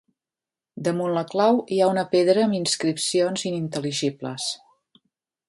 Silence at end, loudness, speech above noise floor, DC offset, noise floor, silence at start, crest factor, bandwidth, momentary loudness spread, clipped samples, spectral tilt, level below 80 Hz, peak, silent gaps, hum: 0.95 s; -23 LUFS; over 68 dB; under 0.1%; under -90 dBFS; 0.75 s; 18 dB; 11.5 kHz; 9 LU; under 0.1%; -4.5 dB/octave; -70 dBFS; -6 dBFS; none; none